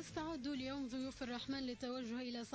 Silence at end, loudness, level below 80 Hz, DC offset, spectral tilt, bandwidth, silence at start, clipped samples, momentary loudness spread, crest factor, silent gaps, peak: 0 s; -44 LUFS; -66 dBFS; under 0.1%; -4.5 dB/octave; 8 kHz; 0 s; under 0.1%; 2 LU; 12 dB; none; -32 dBFS